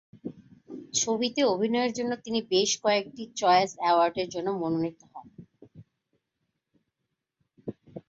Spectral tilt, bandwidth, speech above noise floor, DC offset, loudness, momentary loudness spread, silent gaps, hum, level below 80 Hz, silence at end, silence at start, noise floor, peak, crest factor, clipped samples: -3 dB/octave; 8 kHz; 57 dB; under 0.1%; -26 LUFS; 20 LU; none; none; -70 dBFS; 0.1 s; 0.25 s; -83 dBFS; -10 dBFS; 18 dB; under 0.1%